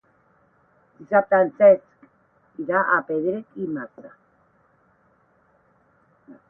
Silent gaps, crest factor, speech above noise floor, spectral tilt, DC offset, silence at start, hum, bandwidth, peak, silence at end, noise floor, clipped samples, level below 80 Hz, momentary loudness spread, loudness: none; 20 dB; 42 dB; -10.5 dB/octave; under 0.1%; 1 s; none; 3.2 kHz; -4 dBFS; 0.15 s; -62 dBFS; under 0.1%; -70 dBFS; 18 LU; -21 LUFS